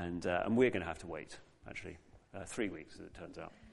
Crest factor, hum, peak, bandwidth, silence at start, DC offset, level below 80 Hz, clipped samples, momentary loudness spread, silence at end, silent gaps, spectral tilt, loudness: 22 dB; none; -16 dBFS; 11.5 kHz; 0 s; under 0.1%; -62 dBFS; under 0.1%; 22 LU; 0 s; none; -5.5 dB/octave; -37 LUFS